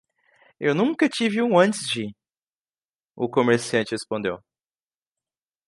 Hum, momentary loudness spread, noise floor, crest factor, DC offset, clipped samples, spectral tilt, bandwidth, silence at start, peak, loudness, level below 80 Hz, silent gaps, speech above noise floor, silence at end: none; 11 LU; under -90 dBFS; 22 dB; under 0.1%; under 0.1%; -5 dB/octave; 11.5 kHz; 0.6 s; -4 dBFS; -23 LUFS; -68 dBFS; 2.43-2.51 s, 2.61-2.65 s, 2.85-2.99 s; over 68 dB; 1.3 s